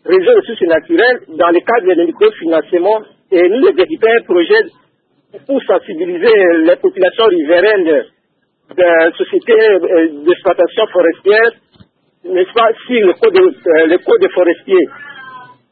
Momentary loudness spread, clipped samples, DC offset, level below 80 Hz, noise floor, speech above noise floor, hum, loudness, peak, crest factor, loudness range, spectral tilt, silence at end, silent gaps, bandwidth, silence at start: 6 LU; under 0.1%; under 0.1%; -60 dBFS; -62 dBFS; 52 dB; none; -11 LUFS; 0 dBFS; 12 dB; 1 LU; -8.5 dB/octave; 0.3 s; none; 4.7 kHz; 0.05 s